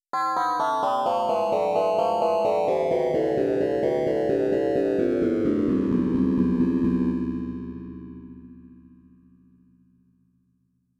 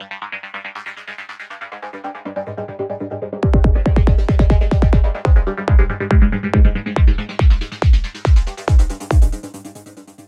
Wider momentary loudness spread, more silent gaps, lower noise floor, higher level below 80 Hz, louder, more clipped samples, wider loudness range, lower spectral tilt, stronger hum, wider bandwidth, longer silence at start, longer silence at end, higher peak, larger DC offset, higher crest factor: second, 11 LU vs 16 LU; neither; first, -69 dBFS vs -39 dBFS; second, -50 dBFS vs -16 dBFS; second, -23 LUFS vs -17 LUFS; neither; about the same, 9 LU vs 7 LU; about the same, -7.5 dB/octave vs -7.5 dB/octave; first, 60 Hz at -50 dBFS vs none; first, 12 kHz vs 9.2 kHz; first, 0.15 s vs 0 s; first, 2.3 s vs 0.25 s; second, -10 dBFS vs 0 dBFS; neither; about the same, 14 dB vs 14 dB